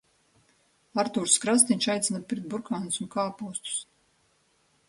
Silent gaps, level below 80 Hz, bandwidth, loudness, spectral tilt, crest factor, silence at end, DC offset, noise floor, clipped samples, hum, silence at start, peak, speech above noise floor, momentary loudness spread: none; -72 dBFS; 11.5 kHz; -26 LUFS; -2.5 dB/octave; 24 dB; 1.05 s; under 0.1%; -68 dBFS; under 0.1%; none; 0.95 s; -4 dBFS; 40 dB; 12 LU